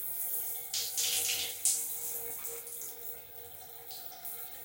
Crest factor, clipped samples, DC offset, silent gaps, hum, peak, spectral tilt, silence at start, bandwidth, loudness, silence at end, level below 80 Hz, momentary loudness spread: 26 dB; under 0.1%; under 0.1%; none; none; -12 dBFS; 2 dB/octave; 0 s; 17 kHz; -33 LUFS; 0 s; -76 dBFS; 14 LU